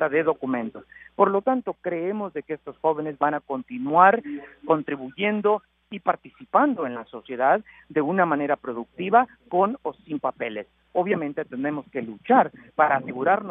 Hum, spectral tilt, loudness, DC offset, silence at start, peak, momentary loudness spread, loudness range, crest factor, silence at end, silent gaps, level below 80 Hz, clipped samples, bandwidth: none; -10 dB/octave; -24 LUFS; under 0.1%; 0 s; -2 dBFS; 13 LU; 3 LU; 22 dB; 0 s; none; -68 dBFS; under 0.1%; 3.9 kHz